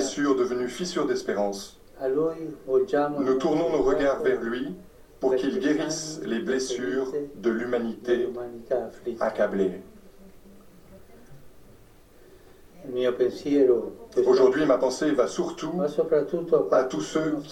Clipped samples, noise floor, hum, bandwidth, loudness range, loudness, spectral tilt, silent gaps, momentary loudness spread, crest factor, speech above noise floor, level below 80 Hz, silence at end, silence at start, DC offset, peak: under 0.1%; -52 dBFS; none; 12.5 kHz; 9 LU; -26 LUFS; -5 dB/octave; none; 9 LU; 18 dB; 27 dB; -54 dBFS; 0 s; 0 s; under 0.1%; -8 dBFS